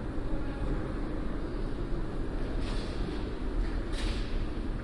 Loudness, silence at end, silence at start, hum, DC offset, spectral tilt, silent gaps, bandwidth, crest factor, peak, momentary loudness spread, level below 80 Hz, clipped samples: -36 LUFS; 0 s; 0 s; none; under 0.1%; -7 dB/octave; none; 11 kHz; 12 dB; -20 dBFS; 2 LU; -34 dBFS; under 0.1%